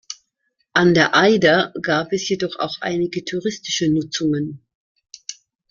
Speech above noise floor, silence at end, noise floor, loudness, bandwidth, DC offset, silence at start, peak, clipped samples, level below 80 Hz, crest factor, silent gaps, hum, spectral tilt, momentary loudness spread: 52 dB; 0.4 s; -71 dBFS; -19 LUFS; 7.4 kHz; under 0.1%; 0.1 s; -2 dBFS; under 0.1%; -58 dBFS; 18 dB; 4.75-4.95 s; none; -4.5 dB/octave; 21 LU